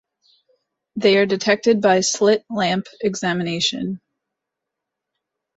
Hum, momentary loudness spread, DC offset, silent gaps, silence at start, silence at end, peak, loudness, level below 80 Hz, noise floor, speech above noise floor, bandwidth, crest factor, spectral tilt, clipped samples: none; 11 LU; under 0.1%; none; 0.95 s; 1.6 s; -2 dBFS; -19 LUFS; -64 dBFS; -82 dBFS; 64 dB; 8.2 kHz; 18 dB; -4 dB/octave; under 0.1%